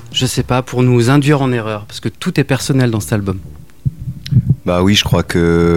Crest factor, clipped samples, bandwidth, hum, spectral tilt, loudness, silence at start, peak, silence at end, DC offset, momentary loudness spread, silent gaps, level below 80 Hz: 14 dB; under 0.1%; 16.5 kHz; none; -5.5 dB/octave; -15 LUFS; 0 s; 0 dBFS; 0 s; 1%; 12 LU; none; -34 dBFS